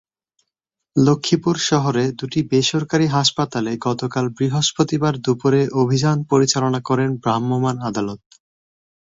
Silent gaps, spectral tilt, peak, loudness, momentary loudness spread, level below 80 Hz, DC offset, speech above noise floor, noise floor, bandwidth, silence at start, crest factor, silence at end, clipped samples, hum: none; -5 dB/octave; -2 dBFS; -19 LUFS; 6 LU; -56 dBFS; under 0.1%; 63 dB; -81 dBFS; 7.8 kHz; 0.95 s; 16 dB; 0.85 s; under 0.1%; none